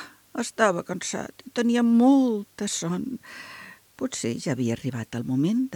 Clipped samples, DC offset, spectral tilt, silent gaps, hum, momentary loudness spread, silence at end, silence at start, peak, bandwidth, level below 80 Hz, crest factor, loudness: under 0.1%; under 0.1%; -5 dB/octave; none; none; 18 LU; 0 s; 0 s; -6 dBFS; 18.5 kHz; -66 dBFS; 20 dB; -25 LUFS